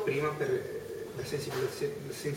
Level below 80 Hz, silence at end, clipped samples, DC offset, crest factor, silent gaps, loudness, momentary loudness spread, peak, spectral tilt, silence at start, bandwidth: -62 dBFS; 0 s; under 0.1%; under 0.1%; 16 dB; none; -35 LUFS; 8 LU; -18 dBFS; -5 dB/octave; 0 s; 16.5 kHz